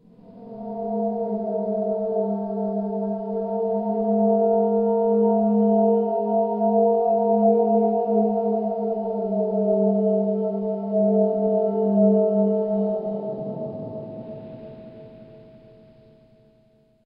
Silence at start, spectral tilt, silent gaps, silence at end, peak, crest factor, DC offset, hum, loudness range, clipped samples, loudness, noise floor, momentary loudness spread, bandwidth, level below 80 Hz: 0.3 s; -14 dB/octave; none; 1.65 s; -8 dBFS; 16 dB; under 0.1%; none; 10 LU; under 0.1%; -22 LUFS; -59 dBFS; 14 LU; 1.9 kHz; -66 dBFS